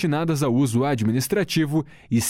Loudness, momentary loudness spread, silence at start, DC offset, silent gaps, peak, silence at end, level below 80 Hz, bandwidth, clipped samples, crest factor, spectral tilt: -22 LUFS; 4 LU; 0 s; under 0.1%; none; -10 dBFS; 0 s; -54 dBFS; 16.5 kHz; under 0.1%; 12 dB; -5.5 dB/octave